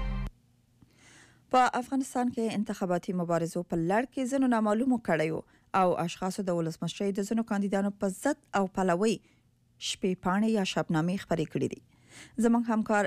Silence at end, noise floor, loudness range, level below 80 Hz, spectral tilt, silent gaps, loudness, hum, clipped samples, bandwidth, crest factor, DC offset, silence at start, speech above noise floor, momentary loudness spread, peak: 0 s; -65 dBFS; 2 LU; -50 dBFS; -5.5 dB/octave; none; -30 LUFS; none; under 0.1%; 15 kHz; 14 dB; under 0.1%; 0 s; 36 dB; 7 LU; -16 dBFS